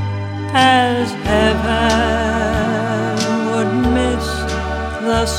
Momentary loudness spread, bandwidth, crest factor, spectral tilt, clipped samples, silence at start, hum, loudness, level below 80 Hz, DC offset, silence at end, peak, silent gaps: 8 LU; 16 kHz; 16 dB; -5 dB/octave; under 0.1%; 0 s; none; -16 LUFS; -28 dBFS; under 0.1%; 0 s; 0 dBFS; none